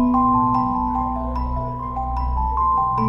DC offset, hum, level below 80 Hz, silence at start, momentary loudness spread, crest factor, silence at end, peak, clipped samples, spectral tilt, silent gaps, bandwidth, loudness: under 0.1%; none; -28 dBFS; 0 s; 9 LU; 12 dB; 0 s; -8 dBFS; under 0.1%; -10.5 dB/octave; none; 5.6 kHz; -21 LUFS